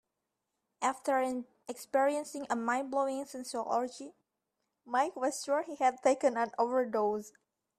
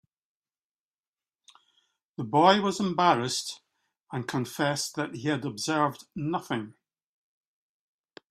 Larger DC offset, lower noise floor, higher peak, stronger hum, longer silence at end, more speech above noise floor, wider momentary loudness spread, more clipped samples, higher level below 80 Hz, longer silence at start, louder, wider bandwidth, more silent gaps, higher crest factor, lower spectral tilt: neither; second, -86 dBFS vs under -90 dBFS; second, -14 dBFS vs -4 dBFS; neither; second, 0.5 s vs 1.6 s; second, 54 dB vs over 63 dB; second, 11 LU vs 17 LU; neither; second, -80 dBFS vs -70 dBFS; second, 0.8 s vs 2.2 s; second, -33 LUFS vs -27 LUFS; second, 14 kHz vs 15.5 kHz; second, none vs 4.00-4.04 s; second, 18 dB vs 26 dB; second, -3 dB/octave vs -4.5 dB/octave